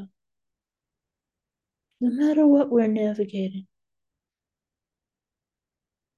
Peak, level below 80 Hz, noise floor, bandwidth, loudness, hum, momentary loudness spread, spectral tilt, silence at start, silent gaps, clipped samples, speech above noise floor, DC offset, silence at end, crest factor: -8 dBFS; -78 dBFS; -90 dBFS; 7 kHz; -22 LUFS; none; 13 LU; -8.5 dB/octave; 0 s; none; under 0.1%; 69 dB; under 0.1%; 2.55 s; 18 dB